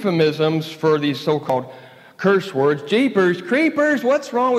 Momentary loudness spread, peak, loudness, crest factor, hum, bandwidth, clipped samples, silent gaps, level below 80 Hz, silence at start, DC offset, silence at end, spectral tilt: 5 LU; -4 dBFS; -19 LUFS; 14 dB; none; 14.5 kHz; under 0.1%; none; -74 dBFS; 0 s; under 0.1%; 0 s; -6.5 dB/octave